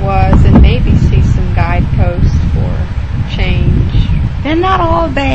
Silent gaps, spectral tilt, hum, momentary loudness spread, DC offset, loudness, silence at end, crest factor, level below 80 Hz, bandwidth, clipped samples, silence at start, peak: none; -8 dB/octave; none; 8 LU; 4%; -11 LUFS; 0 s; 10 dB; -12 dBFS; 7.8 kHz; 0.7%; 0 s; 0 dBFS